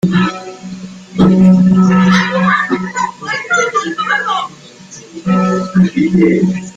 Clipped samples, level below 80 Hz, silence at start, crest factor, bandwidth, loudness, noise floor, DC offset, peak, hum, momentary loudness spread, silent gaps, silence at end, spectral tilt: under 0.1%; -44 dBFS; 0.05 s; 12 dB; 7.8 kHz; -12 LUFS; -35 dBFS; under 0.1%; 0 dBFS; none; 18 LU; none; 0.05 s; -6.5 dB/octave